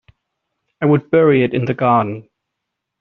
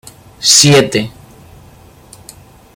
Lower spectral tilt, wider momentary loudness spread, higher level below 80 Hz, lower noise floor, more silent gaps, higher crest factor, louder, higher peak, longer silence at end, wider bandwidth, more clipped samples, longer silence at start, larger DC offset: first, -7 dB/octave vs -3 dB/octave; second, 9 LU vs 14 LU; second, -56 dBFS vs -46 dBFS; first, -78 dBFS vs -41 dBFS; neither; about the same, 14 dB vs 14 dB; second, -15 LUFS vs -8 LUFS; about the same, -2 dBFS vs 0 dBFS; second, 0.8 s vs 1.65 s; second, 5.8 kHz vs over 20 kHz; second, under 0.1% vs 0.2%; first, 0.8 s vs 0.4 s; neither